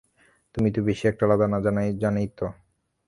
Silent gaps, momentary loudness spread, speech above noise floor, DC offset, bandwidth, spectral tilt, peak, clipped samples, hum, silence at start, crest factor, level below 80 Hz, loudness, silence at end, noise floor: none; 11 LU; 39 dB; under 0.1%; 11.5 kHz; -8.5 dB/octave; -6 dBFS; under 0.1%; none; 0.55 s; 18 dB; -50 dBFS; -24 LUFS; 0.55 s; -63 dBFS